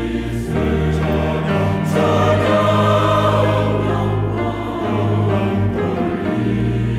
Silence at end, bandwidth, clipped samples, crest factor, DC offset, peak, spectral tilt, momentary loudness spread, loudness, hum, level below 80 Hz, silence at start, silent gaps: 0 s; 13.5 kHz; under 0.1%; 12 dB; under 0.1%; -4 dBFS; -7.5 dB/octave; 6 LU; -17 LUFS; none; -34 dBFS; 0 s; none